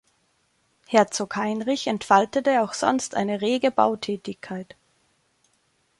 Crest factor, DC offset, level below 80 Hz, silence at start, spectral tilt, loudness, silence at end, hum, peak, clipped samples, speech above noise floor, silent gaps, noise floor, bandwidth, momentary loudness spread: 22 dB; under 0.1%; -66 dBFS; 0.9 s; -4 dB/octave; -23 LUFS; 1.35 s; none; -4 dBFS; under 0.1%; 45 dB; none; -68 dBFS; 11.5 kHz; 14 LU